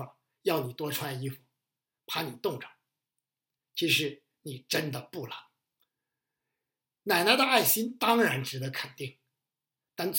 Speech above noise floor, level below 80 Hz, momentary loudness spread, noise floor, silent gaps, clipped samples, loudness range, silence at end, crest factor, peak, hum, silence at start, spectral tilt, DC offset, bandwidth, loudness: over 61 dB; -84 dBFS; 21 LU; under -90 dBFS; none; under 0.1%; 8 LU; 0 s; 26 dB; -6 dBFS; none; 0 s; -3.5 dB/octave; under 0.1%; 17 kHz; -28 LUFS